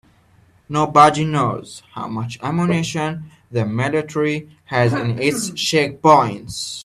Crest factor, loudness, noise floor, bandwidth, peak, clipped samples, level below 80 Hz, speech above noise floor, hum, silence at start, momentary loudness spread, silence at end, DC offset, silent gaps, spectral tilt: 18 dB; -18 LUFS; -54 dBFS; 13.5 kHz; 0 dBFS; under 0.1%; -54 dBFS; 35 dB; none; 0.7 s; 14 LU; 0 s; under 0.1%; none; -5 dB/octave